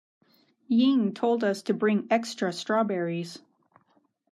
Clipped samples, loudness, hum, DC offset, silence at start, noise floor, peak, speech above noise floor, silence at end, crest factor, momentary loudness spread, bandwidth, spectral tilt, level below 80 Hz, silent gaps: under 0.1%; -26 LUFS; none; under 0.1%; 0.7 s; -68 dBFS; -12 dBFS; 43 dB; 0.95 s; 16 dB; 9 LU; 12.5 kHz; -6 dB/octave; -84 dBFS; none